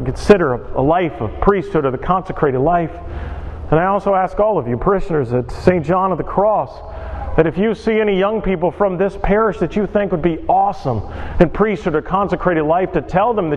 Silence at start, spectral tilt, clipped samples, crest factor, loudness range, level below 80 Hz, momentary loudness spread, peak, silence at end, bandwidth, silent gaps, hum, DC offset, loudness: 0 s; -8 dB/octave; under 0.1%; 16 dB; 1 LU; -30 dBFS; 7 LU; 0 dBFS; 0 s; 10 kHz; none; none; under 0.1%; -17 LUFS